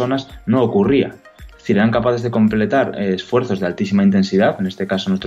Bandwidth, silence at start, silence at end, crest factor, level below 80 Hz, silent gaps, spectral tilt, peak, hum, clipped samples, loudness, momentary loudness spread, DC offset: 7.6 kHz; 0 s; 0 s; 12 dB; -46 dBFS; none; -7.5 dB/octave; -4 dBFS; none; under 0.1%; -17 LUFS; 7 LU; under 0.1%